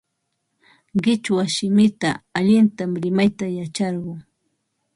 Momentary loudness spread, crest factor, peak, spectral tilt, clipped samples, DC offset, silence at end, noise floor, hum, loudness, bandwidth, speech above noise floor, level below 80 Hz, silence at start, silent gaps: 10 LU; 16 dB; -6 dBFS; -5.5 dB/octave; under 0.1%; under 0.1%; 0.75 s; -75 dBFS; none; -20 LUFS; 11.5 kHz; 55 dB; -58 dBFS; 0.95 s; none